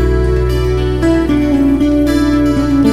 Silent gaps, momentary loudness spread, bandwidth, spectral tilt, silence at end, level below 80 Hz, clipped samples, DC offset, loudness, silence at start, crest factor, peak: none; 3 LU; 14.5 kHz; -7.5 dB/octave; 0 s; -18 dBFS; under 0.1%; 2%; -13 LUFS; 0 s; 10 dB; 0 dBFS